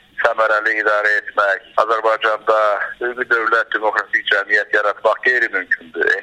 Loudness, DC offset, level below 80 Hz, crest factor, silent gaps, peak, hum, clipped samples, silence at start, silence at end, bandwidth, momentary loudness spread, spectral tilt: -16 LUFS; under 0.1%; -64 dBFS; 18 dB; none; 0 dBFS; none; under 0.1%; 0.15 s; 0 s; 10.5 kHz; 4 LU; -2 dB/octave